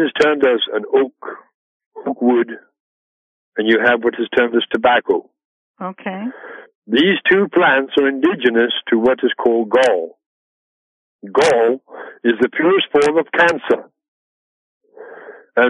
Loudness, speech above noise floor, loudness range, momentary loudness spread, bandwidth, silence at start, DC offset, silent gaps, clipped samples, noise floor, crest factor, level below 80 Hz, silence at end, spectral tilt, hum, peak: -16 LUFS; 22 dB; 4 LU; 15 LU; 11.5 kHz; 0 s; under 0.1%; 1.54-1.80 s, 1.86-1.91 s, 2.80-3.52 s, 5.45-5.74 s, 6.75-6.82 s, 10.26-11.19 s, 14.08-14.81 s; under 0.1%; -38 dBFS; 14 dB; -60 dBFS; 0 s; -4.5 dB/octave; none; -2 dBFS